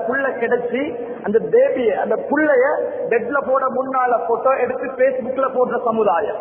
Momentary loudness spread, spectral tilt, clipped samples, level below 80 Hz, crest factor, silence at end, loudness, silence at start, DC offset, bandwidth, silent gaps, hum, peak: 5 LU; -10 dB/octave; under 0.1%; -60 dBFS; 14 dB; 0 s; -18 LUFS; 0 s; under 0.1%; 3.5 kHz; none; none; -4 dBFS